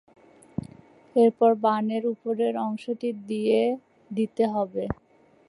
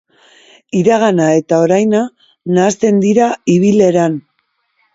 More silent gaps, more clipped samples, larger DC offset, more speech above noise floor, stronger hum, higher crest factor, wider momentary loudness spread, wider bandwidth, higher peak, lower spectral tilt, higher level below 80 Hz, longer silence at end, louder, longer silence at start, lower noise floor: neither; neither; neither; second, 26 dB vs 53 dB; neither; about the same, 16 dB vs 12 dB; first, 16 LU vs 8 LU; first, 11 kHz vs 7.8 kHz; second, -10 dBFS vs 0 dBFS; about the same, -7.5 dB/octave vs -6.5 dB/octave; about the same, -58 dBFS vs -56 dBFS; second, 0.55 s vs 0.75 s; second, -25 LUFS vs -12 LUFS; first, 1.15 s vs 0.75 s; second, -50 dBFS vs -64 dBFS